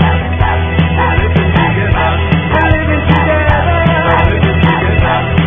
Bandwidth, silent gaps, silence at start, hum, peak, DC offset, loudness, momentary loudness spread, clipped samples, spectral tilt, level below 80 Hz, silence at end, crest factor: 3.7 kHz; none; 0 s; none; 0 dBFS; 2%; -11 LUFS; 2 LU; 0.2%; -9.5 dB/octave; -16 dBFS; 0 s; 10 dB